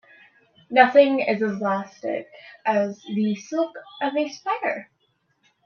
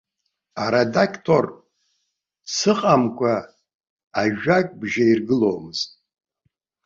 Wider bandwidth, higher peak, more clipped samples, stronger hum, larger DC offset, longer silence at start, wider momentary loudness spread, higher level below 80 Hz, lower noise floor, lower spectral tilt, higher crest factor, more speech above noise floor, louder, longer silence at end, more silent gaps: second, 6.8 kHz vs 7.6 kHz; about the same, 0 dBFS vs -2 dBFS; neither; neither; neither; first, 0.7 s vs 0.55 s; first, 14 LU vs 10 LU; second, -76 dBFS vs -60 dBFS; second, -69 dBFS vs -76 dBFS; about the same, -5.5 dB/octave vs -5 dB/octave; about the same, 22 dB vs 20 dB; second, 47 dB vs 56 dB; about the same, -23 LUFS vs -21 LUFS; second, 0.8 s vs 0.95 s; second, none vs 3.74-3.84 s, 3.90-3.97 s, 4.07-4.11 s